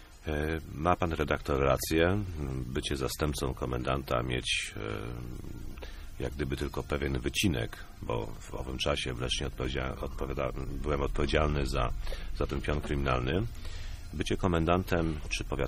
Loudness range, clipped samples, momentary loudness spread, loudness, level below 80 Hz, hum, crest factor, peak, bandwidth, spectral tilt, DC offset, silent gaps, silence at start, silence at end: 4 LU; under 0.1%; 12 LU; -32 LUFS; -38 dBFS; none; 22 dB; -10 dBFS; 15.5 kHz; -5 dB/octave; under 0.1%; none; 0 s; 0 s